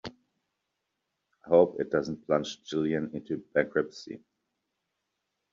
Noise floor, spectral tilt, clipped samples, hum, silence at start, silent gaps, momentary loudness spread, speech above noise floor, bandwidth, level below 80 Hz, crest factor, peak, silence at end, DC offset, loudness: -83 dBFS; -5 dB/octave; under 0.1%; none; 0.05 s; none; 20 LU; 54 dB; 7.4 kHz; -68 dBFS; 22 dB; -8 dBFS; 1.35 s; under 0.1%; -29 LUFS